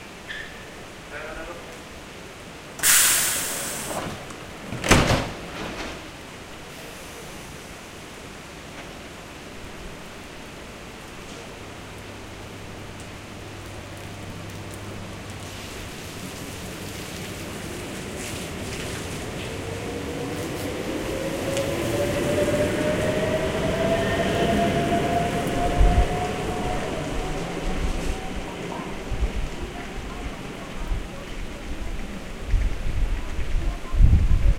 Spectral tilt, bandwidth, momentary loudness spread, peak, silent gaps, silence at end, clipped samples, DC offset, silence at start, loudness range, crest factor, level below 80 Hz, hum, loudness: -4 dB/octave; 16 kHz; 17 LU; 0 dBFS; none; 0 s; under 0.1%; under 0.1%; 0 s; 16 LU; 26 dB; -30 dBFS; none; -26 LUFS